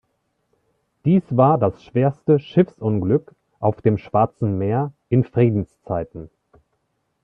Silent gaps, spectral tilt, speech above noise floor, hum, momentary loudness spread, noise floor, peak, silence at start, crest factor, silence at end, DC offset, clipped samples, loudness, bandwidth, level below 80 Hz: none; -11 dB/octave; 52 dB; none; 10 LU; -71 dBFS; -2 dBFS; 1.05 s; 20 dB; 1 s; under 0.1%; under 0.1%; -20 LUFS; 4.9 kHz; -54 dBFS